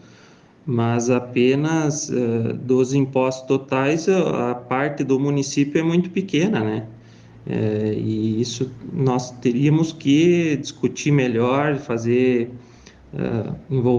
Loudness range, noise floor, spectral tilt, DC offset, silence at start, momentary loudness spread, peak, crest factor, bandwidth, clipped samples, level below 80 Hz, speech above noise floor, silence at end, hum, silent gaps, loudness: 3 LU; -49 dBFS; -6.5 dB/octave; under 0.1%; 0.65 s; 7 LU; -6 dBFS; 14 dB; 9.8 kHz; under 0.1%; -56 dBFS; 29 dB; 0 s; none; none; -21 LUFS